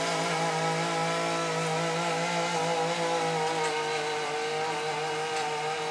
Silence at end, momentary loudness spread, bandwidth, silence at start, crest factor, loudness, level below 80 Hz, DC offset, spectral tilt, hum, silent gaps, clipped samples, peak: 0 s; 3 LU; 11 kHz; 0 s; 12 dB; -29 LUFS; -84 dBFS; under 0.1%; -3.5 dB/octave; none; none; under 0.1%; -16 dBFS